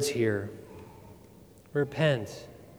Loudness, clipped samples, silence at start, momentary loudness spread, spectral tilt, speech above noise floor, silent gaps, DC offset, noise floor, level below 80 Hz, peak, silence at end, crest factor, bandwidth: -30 LUFS; under 0.1%; 0 s; 23 LU; -5.5 dB/octave; 25 dB; none; under 0.1%; -54 dBFS; -62 dBFS; -12 dBFS; 0 s; 20 dB; over 20 kHz